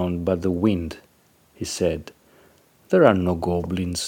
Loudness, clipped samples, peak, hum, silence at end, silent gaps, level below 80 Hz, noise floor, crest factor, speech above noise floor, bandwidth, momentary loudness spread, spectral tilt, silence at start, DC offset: -22 LUFS; under 0.1%; 0 dBFS; none; 0 s; none; -46 dBFS; -59 dBFS; 22 dB; 38 dB; 17 kHz; 16 LU; -6 dB/octave; 0 s; under 0.1%